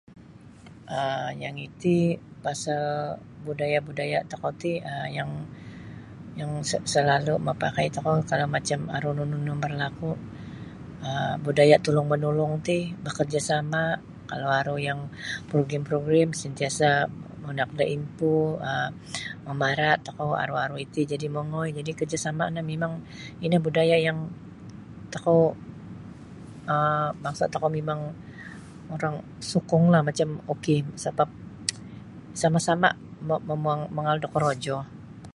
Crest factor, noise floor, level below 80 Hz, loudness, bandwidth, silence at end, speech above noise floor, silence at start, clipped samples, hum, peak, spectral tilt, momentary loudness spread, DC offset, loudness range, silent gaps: 24 dB; -48 dBFS; -56 dBFS; -26 LUFS; 11.5 kHz; 0.05 s; 22 dB; 0.1 s; under 0.1%; none; -4 dBFS; -5.5 dB/octave; 18 LU; under 0.1%; 5 LU; none